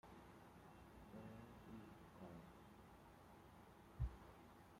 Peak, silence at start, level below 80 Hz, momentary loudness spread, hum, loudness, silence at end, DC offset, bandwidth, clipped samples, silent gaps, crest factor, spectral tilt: -34 dBFS; 0.05 s; -62 dBFS; 13 LU; none; -60 LUFS; 0 s; under 0.1%; 16 kHz; under 0.1%; none; 24 dB; -7 dB/octave